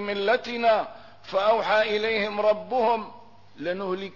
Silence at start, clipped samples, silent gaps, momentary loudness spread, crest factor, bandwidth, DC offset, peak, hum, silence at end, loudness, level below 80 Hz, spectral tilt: 0 s; under 0.1%; none; 11 LU; 14 dB; 6 kHz; 0.3%; -12 dBFS; none; 0.05 s; -24 LUFS; -66 dBFS; -5 dB/octave